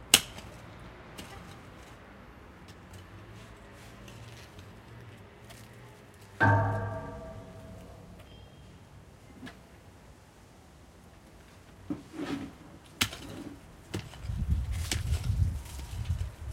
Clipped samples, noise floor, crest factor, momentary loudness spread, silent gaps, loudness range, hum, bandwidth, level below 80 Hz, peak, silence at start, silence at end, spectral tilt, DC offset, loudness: under 0.1%; -55 dBFS; 36 dB; 22 LU; none; 18 LU; none; 16 kHz; -44 dBFS; 0 dBFS; 0 s; 0 s; -3.5 dB/octave; under 0.1%; -33 LUFS